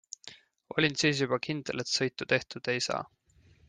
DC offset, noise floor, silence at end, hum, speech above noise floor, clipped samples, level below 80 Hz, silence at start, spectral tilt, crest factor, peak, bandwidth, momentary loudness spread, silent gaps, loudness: under 0.1%; -62 dBFS; 0.6 s; none; 32 dB; under 0.1%; -68 dBFS; 0.25 s; -3.5 dB/octave; 20 dB; -12 dBFS; 10.5 kHz; 19 LU; none; -30 LUFS